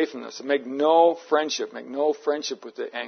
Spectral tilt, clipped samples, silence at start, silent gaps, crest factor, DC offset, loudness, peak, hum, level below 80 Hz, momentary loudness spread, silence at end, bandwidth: -2.5 dB/octave; under 0.1%; 0 s; none; 18 dB; under 0.1%; -24 LUFS; -6 dBFS; none; -86 dBFS; 14 LU; 0 s; 6.6 kHz